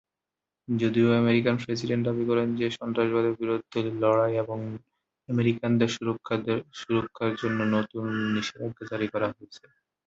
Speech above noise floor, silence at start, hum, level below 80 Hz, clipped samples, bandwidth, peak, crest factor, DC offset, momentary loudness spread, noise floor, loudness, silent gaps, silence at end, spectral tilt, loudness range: 62 dB; 0.7 s; none; -64 dBFS; under 0.1%; 7.8 kHz; -8 dBFS; 18 dB; under 0.1%; 9 LU; -88 dBFS; -27 LUFS; none; 0.5 s; -7 dB/octave; 3 LU